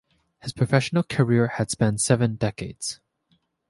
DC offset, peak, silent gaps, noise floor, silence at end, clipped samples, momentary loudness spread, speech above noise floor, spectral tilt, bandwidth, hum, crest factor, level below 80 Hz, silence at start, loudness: under 0.1%; -4 dBFS; none; -68 dBFS; 0.75 s; under 0.1%; 12 LU; 46 dB; -5.5 dB/octave; 11.5 kHz; none; 20 dB; -54 dBFS; 0.45 s; -23 LUFS